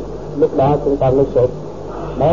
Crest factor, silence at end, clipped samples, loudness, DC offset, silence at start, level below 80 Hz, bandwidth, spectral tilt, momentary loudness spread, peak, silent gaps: 14 dB; 0 s; under 0.1%; -16 LUFS; 2%; 0 s; -34 dBFS; 7.4 kHz; -9 dB/octave; 13 LU; -2 dBFS; none